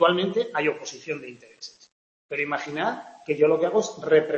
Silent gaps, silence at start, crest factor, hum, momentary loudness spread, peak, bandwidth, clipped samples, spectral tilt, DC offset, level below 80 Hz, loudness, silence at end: 1.92-2.29 s; 0 s; 20 dB; none; 20 LU; -6 dBFS; 7.6 kHz; under 0.1%; -4.5 dB/octave; under 0.1%; -72 dBFS; -25 LUFS; 0 s